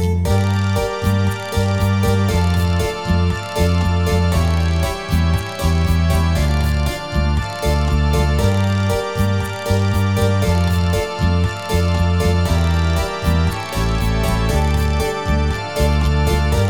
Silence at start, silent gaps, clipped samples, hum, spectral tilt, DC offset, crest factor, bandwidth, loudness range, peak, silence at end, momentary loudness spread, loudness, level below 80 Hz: 0 s; none; under 0.1%; none; -6 dB/octave; 0.7%; 12 dB; 18 kHz; 1 LU; -4 dBFS; 0 s; 3 LU; -18 LUFS; -24 dBFS